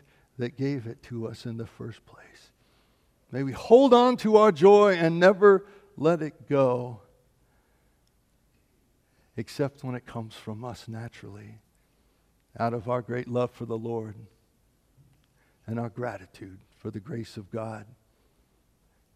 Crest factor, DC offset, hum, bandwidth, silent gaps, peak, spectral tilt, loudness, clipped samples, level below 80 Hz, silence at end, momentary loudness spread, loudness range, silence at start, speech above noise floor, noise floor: 22 dB; under 0.1%; none; 12 kHz; none; -4 dBFS; -7 dB/octave; -24 LUFS; under 0.1%; -66 dBFS; 1.35 s; 24 LU; 19 LU; 0.4 s; 42 dB; -67 dBFS